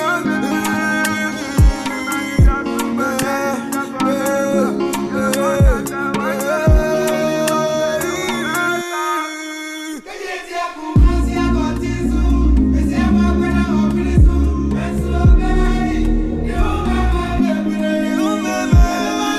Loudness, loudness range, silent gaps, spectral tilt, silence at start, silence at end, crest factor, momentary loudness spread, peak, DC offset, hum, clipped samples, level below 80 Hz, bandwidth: -17 LUFS; 4 LU; none; -6 dB/octave; 0 s; 0 s; 14 dB; 6 LU; -2 dBFS; under 0.1%; none; under 0.1%; -20 dBFS; 14 kHz